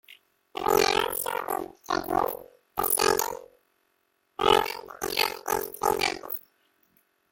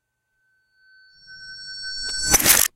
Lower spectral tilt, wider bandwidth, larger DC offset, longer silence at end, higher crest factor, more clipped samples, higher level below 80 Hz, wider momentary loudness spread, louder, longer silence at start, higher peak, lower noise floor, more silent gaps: first, -2 dB/octave vs 0 dB/octave; about the same, 17 kHz vs 17 kHz; neither; first, 0.9 s vs 0.1 s; about the same, 26 dB vs 24 dB; neither; second, -56 dBFS vs -44 dBFS; second, 13 LU vs 24 LU; second, -27 LUFS vs -18 LUFS; second, 0.1 s vs 1.3 s; second, -4 dBFS vs 0 dBFS; about the same, -72 dBFS vs -71 dBFS; neither